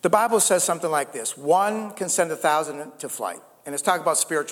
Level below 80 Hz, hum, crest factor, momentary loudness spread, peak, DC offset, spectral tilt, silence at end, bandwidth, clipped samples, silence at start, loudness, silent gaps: -72 dBFS; none; 18 dB; 14 LU; -4 dBFS; under 0.1%; -2.5 dB/octave; 0 s; 19 kHz; under 0.1%; 0.05 s; -23 LUFS; none